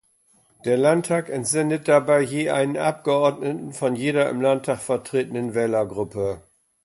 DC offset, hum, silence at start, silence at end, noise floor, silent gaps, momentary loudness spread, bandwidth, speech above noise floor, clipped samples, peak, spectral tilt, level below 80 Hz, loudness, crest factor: under 0.1%; none; 0.65 s; 0.45 s; -61 dBFS; none; 8 LU; 11.5 kHz; 40 dB; under 0.1%; -6 dBFS; -5 dB/octave; -60 dBFS; -22 LUFS; 16 dB